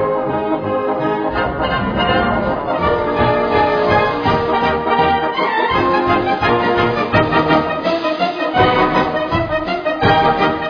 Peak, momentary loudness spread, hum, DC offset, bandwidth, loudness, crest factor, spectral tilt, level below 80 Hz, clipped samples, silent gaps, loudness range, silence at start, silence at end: 0 dBFS; 5 LU; none; under 0.1%; 5.4 kHz; -16 LUFS; 14 dB; -7.5 dB/octave; -36 dBFS; under 0.1%; none; 2 LU; 0 s; 0 s